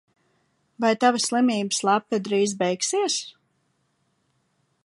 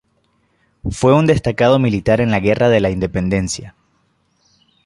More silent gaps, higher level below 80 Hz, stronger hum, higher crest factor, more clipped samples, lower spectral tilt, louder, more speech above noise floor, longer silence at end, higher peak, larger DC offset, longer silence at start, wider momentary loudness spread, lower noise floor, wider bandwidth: neither; second, -78 dBFS vs -38 dBFS; neither; about the same, 20 dB vs 16 dB; neither; second, -3 dB/octave vs -6.5 dB/octave; second, -23 LUFS vs -15 LUFS; about the same, 48 dB vs 47 dB; first, 1.55 s vs 1.15 s; second, -4 dBFS vs 0 dBFS; neither; about the same, 0.8 s vs 0.85 s; second, 5 LU vs 11 LU; first, -70 dBFS vs -62 dBFS; about the same, 11.5 kHz vs 11.5 kHz